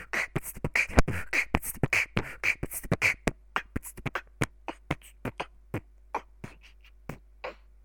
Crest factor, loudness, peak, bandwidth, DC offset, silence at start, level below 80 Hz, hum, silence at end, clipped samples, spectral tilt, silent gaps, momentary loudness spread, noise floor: 30 dB; -31 LUFS; -2 dBFS; 19.5 kHz; under 0.1%; 0 s; -42 dBFS; none; 0.3 s; under 0.1%; -4.5 dB/octave; none; 17 LU; -54 dBFS